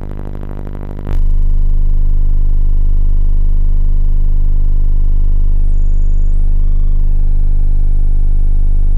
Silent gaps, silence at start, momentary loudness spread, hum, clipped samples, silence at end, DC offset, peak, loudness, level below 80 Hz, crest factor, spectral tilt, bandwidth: none; 0 s; 4 LU; 50 Hz at -45 dBFS; under 0.1%; 0 s; under 0.1%; -6 dBFS; -18 LUFS; -8 dBFS; 2 dB; -10 dB/octave; 1.2 kHz